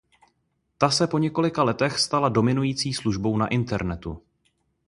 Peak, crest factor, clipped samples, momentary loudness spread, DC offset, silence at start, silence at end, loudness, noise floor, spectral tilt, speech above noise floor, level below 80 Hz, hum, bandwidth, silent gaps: -2 dBFS; 22 dB; under 0.1%; 8 LU; under 0.1%; 0.8 s; 0.7 s; -23 LUFS; -73 dBFS; -5 dB/octave; 49 dB; -48 dBFS; none; 11.5 kHz; none